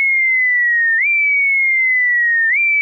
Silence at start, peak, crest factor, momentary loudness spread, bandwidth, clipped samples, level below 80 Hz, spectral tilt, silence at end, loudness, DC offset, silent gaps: 0 s; -10 dBFS; 4 dB; 0 LU; 4.6 kHz; under 0.1%; -82 dBFS; 0.5 dB/octave; 0 s; -12 LUFS; under 0.1%; none